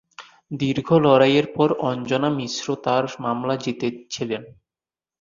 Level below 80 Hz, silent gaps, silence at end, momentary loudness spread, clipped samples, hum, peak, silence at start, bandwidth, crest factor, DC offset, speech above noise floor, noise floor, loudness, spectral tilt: -60 dBFS; none; 0.7 s; 12 LU; under 0.1%; none; -2 dBFS; 0.2 s; 7.4 kHz; 20 dB; under 0.1%; over 69 dB; under -90 dBFS; -21 LUFS; -6 dB/octave